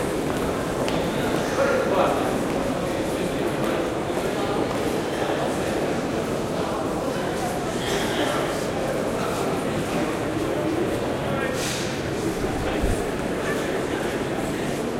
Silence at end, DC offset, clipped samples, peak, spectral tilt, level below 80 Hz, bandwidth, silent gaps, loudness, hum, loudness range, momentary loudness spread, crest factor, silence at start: 0 s; under 0.1%; under 0.1%; -4 dBFS; -5 dB/octave; -40 dBFS; 16 kHz; none; -25 LUFS; none; 2 LU; 3 LU; 20 dB; 0 s